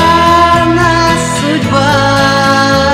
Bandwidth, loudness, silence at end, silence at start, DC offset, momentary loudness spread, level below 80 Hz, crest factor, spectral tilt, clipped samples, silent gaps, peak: 16.5 kHz; -8 LUFS; 0 s; 0 s; under 0.1%; 5 LU; -28 dBFS; 8 dB; -4.5 dB/octave; 0.9%; none; 0 dBFS